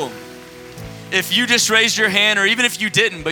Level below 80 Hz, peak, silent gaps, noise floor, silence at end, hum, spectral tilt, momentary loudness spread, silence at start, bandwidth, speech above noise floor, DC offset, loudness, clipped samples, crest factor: -52 dBFS; 0 dBFS; none; -37 dBFS; 0 s; none; -1.5 dB/octave; 21 LU; 0 s; 19.5 kHz; 20 dB; under 0.1%; -14 LUFS; under 0.1%; 18 dB